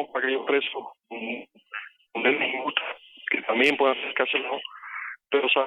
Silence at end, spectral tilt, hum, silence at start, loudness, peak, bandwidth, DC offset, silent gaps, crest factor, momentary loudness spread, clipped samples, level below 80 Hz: 0 s; -3.5 dB/octave; none; 0 s; -26 LUFS; -6 dBFS; 11 kHz; under 0.1%; none; 22 dB; 16 LU; under 0.1%; -80 dBFS